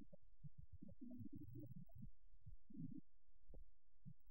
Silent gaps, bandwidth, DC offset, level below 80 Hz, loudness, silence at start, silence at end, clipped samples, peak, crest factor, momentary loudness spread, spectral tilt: none; 16 kHz; 0.2%; -68 dBFS; -62 LUFS; 0 s; 0 s; under 0.1%; -40 dBFS; 18 dB; 11 LU; -10 dB/octave